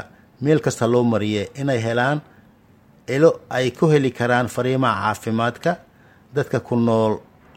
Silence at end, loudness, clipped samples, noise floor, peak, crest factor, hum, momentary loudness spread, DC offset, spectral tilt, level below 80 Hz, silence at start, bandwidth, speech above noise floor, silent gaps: 0.35 s; -20 LUFS; under 0.1%; -52 dBFS; -2 dBFS; 18 dB; none; 9 LU; under 0.1%; -6.5 dB/octave; -58 dBFS; 0 s; 16 kHz; 33 dB; none